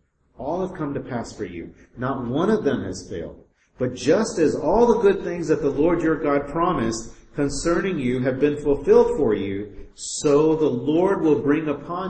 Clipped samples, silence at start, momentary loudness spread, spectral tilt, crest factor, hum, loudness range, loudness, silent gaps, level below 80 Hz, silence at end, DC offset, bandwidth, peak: under 0.1%; 0.4 s; 15 LU; -6 dB/octave; 18 dB; none; 6 LU; -22 LUFS; none; -42 dBFS; 0 s; under 0.1%; 8.8 kHz; -4 dBFS